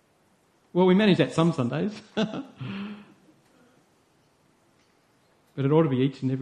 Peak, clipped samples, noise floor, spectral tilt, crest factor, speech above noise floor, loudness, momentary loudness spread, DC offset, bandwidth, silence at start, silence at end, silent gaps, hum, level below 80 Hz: -8 dBFS; under 0.1%; -64 dBFS; -7.5 dB/octave; 20 dB; 41 dB; -25 LUFS; 17 LU; under 0.1%; 10.5 kHz; 0.75 s; 0 s; none; none; -66 dBFS